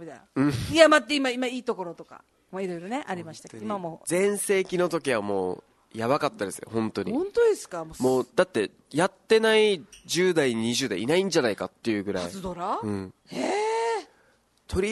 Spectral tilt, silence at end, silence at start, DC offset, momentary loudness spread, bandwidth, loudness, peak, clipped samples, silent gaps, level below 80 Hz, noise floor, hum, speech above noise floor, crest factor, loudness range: -4 dB/octave; 0 s; 0 s; under 0.1%; 13 LU; 12.5 kHz; -26 LUFS; -2 dBFS; under 0.1%; none; -56 dBFS; -64 dBFS; none; 38 dB; 24 dB; 6 LU